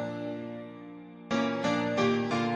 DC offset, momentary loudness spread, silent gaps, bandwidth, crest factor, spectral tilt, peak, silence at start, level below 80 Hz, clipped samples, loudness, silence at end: under 0.1%; 18 LU; none; 10 kHz; 16 dB; -5.5 dB/octave; -14 dBFS; 0 s; -66 dBFS; under 0.1%; -30 LUFS; 0 s